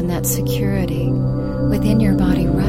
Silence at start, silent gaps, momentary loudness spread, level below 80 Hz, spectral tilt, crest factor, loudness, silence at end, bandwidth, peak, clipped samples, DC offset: 0 s; none; 4 LU; -28 dBFS; -6.5 dB/octave; 14 dB; -18 LUFS; 0 s; 16 kHz; -4 dBFS; under 0.1%; 0.7%